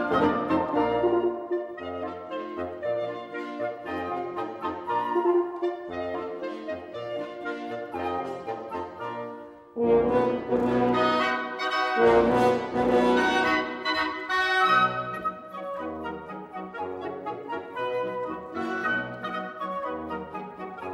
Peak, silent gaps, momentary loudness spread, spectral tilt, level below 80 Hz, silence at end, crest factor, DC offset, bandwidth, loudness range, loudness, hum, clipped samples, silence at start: -8 dBFS; none; 13 LU; -5.5 dB/octave; -56 dBFS; 0 s; 18 dB; under 0.1%; 12.5 kHz; 10 LU; -27 LUFS; none; under 0.1%; 0 s